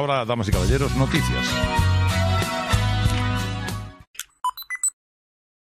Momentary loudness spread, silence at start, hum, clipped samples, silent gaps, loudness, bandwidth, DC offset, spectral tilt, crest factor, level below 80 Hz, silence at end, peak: 9 LU; 0 s; none; under 0.1%; 4.07-4.14 s; -22 LUFS; 15 kHz; under 0.1%; -4.5 dB/octave; 16 dB; -32 dBFS; 0.9 s; -6 dBFS